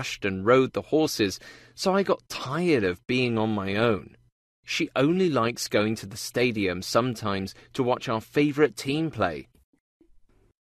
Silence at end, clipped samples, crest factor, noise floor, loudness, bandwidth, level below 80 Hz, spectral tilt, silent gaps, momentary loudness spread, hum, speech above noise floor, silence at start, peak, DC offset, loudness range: 1.2 s; under 0.1%; 18 dB; -58 dBFS; -26 LUFS; 14 kHz; -60 dBFS; -5 dB/octave; 4.32-4.63 s; 9 LU; none; 32 dB; 0 s; -8 dBFS; under 0.1%; 2 LU